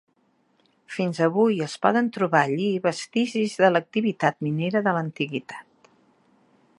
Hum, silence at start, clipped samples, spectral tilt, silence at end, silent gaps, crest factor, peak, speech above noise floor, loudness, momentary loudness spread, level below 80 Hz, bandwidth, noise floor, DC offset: none; 0.9 s; under 0.1%; -6 dB/octave; 1.2 s; none; 22 dB; -4 dBFS; 43 dB; -23 LUFS; 9 LU; -74 dBFS; 11.5 kHz; -66 dBFS; under 0.1%